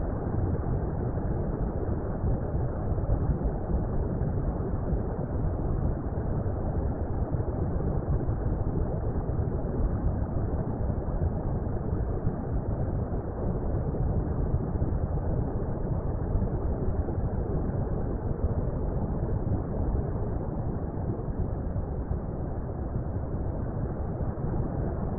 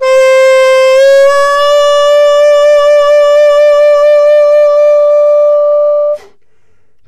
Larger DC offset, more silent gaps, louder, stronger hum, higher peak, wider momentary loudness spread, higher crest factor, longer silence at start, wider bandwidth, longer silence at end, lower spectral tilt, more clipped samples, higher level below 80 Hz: neither; neither; second, -31 LUFS vs -6 LUFS; neither; second, -14 dBFS vs -2 dBFS; about the same, 3 LU vs 3 LU; first, 14 dB vs 4 dB; about the same, 0 s vs 0 s; second, 2.3 kHz vs 12 kHz; second, 0 s vs 0.9 s; first, -15 dB/octave vs 0.5 dB/octave; neither; first, -34 dBFS vs -46 dBFS